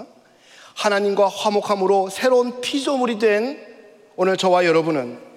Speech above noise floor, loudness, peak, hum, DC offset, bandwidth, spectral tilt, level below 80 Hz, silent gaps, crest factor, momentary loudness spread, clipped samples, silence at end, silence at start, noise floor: 31 dB; -19 LUFS; -6 dBFS; none; under 0.1%; 15 kHz; -4.5 dB/octave; -74 dBFS; none; 14 dB; 8 LU; under 0.1%; 0.1 s; 0 s; -50 dBFS